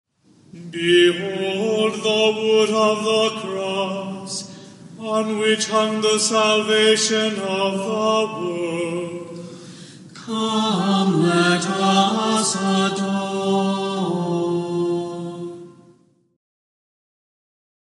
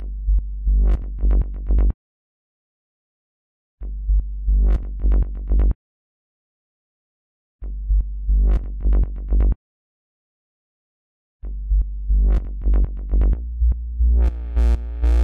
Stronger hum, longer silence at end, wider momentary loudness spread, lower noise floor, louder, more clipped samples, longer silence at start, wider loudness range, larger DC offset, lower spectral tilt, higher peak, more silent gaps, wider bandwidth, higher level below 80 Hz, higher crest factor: neither; first, 2.3 s vs 0 s; first, 17 LU vs 11 LU; second, -55 dBFS vs under -90 dBFS; first, -19 LUFS vs -22 LUFS; neither; first, 0.55 s vs 0 s; about the same, 6 LU vs 5 LU; second, under 0.1% vs 0.2%; second, -4 dB/octave vs -9.5 dB/octave; first, -4 dBFS vs -8 dBFS; second, none vs 1.94-3.78 s, 5.75-7.59 s, 9.56-11.40 s; first, 11.5 kHz vs 2.4 kHz; second, -74 dBFS vs -20 dBFS; first, 18 dB vs 12 dB